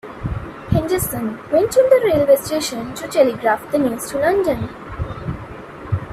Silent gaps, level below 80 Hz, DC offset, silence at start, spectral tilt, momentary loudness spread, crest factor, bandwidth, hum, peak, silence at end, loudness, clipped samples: none; -38 dBFS; under 0.1%; 0.05 s; -5.5 dB/octave; 15 LU; 16 dB; 16 kHz; none; -2 dBFS; 0 s; -18 LUFS; under 0.1%